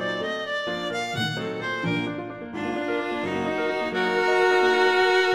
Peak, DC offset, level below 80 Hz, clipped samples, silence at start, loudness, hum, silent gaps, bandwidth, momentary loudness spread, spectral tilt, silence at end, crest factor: -8 dBFS; under 0.1%; -62 dBFS; under 0.1%; 0 s; -24 LUFS; none; none; 13.5 kHz; 10 LU; -5 dB/octave; 0 s; 16 dB